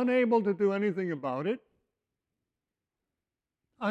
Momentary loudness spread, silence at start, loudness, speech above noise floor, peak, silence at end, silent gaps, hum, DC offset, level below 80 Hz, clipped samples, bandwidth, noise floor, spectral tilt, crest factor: 10 LU; 0 s; -30 LUFS; 61 dB; -14 dBFS; 0 s; none; none; under 0.1%; -80 dBFS; under 0.1%; 7.8 kHz; -90 dBFS; -8 dB/octave; 18 dB